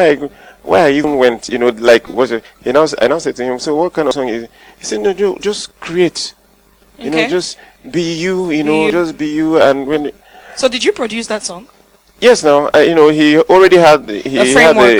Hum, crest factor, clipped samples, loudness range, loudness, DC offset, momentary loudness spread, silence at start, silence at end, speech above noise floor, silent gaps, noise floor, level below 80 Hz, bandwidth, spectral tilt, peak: none; 12 dB; 0.3%; 8 LU; -12 LUFS; under 0.1%; 15 LU; 0 s; 0 s; 38 dB; none; -49 dBFS; -46 dBFS; 19.5 kHz; -4 dB/octave; 0 dBFS